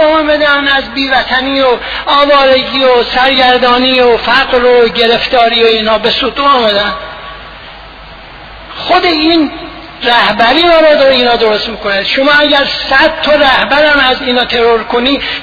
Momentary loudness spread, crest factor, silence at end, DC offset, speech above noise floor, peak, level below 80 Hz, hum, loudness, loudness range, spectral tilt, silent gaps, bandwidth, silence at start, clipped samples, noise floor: 8 LU; 8 dB; 0 s; under 0.1%; 22 dB; 0 dBFS; -36 dBFS; none; -8 LUFS; 5 LU; -4.5 dB/octave; none; 5.4 kHz; 0 s; 0.2%; -30 dBFS